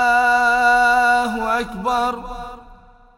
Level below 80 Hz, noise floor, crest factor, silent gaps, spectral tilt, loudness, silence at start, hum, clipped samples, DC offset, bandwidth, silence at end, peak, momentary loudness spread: -42 dBFS; -46 dBFS; 14 dB; none; -3 dB/octave; -16 LUFS; 0 s; none; under 0.1%; under 0.1%; 16.5 kHz; 0.45 s; -4 dBFS; 18 LU